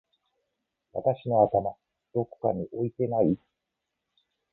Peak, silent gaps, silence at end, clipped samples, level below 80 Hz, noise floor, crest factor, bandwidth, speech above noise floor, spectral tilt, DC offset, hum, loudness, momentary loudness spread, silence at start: -8 dBFS; none; 1.15 s; under 0.1%; -60 dBFS; -84 dBFS; 22 dB; 4 kHz; 58 dB; -12.5 dB/octave; under 0.1%; none; -28 LUFS; 11 LU; 0.95 s